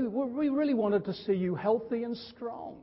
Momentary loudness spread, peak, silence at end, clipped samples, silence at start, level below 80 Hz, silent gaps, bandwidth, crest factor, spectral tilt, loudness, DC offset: 11 LU; -16 dBFS; 0 s; under 0.1%; 0 s; -66 dBFS; none; 5.8 kHz; 14 dB; -11 dB/octave; -31 LUFS; under 0.1%